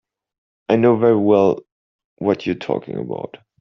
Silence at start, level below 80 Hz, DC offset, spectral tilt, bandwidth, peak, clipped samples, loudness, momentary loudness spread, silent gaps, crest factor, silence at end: 0.7 s; -60 dBFS; under 0.1%; -6.5 dB/octave; 6.4 kHz; -2 dBFS; under 0.1%; -18 LUFS; 15 LU; 1.72-1.99 s, 2.05-2.17 s; 16 dB; 0.25 s